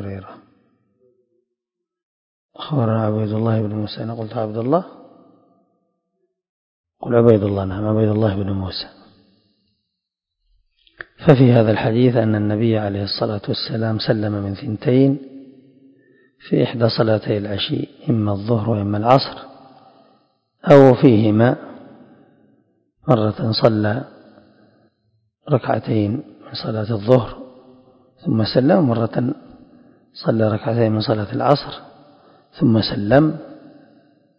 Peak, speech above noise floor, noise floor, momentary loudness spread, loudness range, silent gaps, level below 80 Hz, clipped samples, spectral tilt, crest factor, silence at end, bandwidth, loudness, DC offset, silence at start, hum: 0 dBFS; 65 dB; -82 dBFS; 15 LU; 8 LU; 2.03-2.49 s, 6.49-6.84 s; -48 dBFS; under 0.1%; -9.5 dB/octave; 20 dB; 0.8 s; 6.2 kHz; -18 LUFS; under 0.1%; 0 s; none